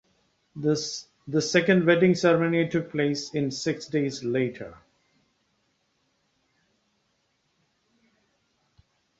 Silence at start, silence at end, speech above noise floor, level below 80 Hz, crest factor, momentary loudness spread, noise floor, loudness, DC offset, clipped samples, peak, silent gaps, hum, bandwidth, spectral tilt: 0.55 s; 4.45 s; 48 dB; -66 dBFS; 22 dB; 12 LU; -72 dBFS; -25 LUFS; under 0.1%; under 0.1%; -6 dBFS; none; none; 8 kHz; -5.5 dB/octave